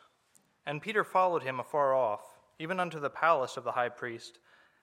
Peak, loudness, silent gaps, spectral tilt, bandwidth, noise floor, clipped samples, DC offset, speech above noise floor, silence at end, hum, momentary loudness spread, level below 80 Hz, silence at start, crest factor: -12 dBFS; -31 LUFS; none; -5 dB/octave; 16 kHz; -69 dBFS; under 0.1%; under 0.1%; 38 dB; 0.5 s; none; 14 LU; -84 dBFS; 0.65 s; 20 dB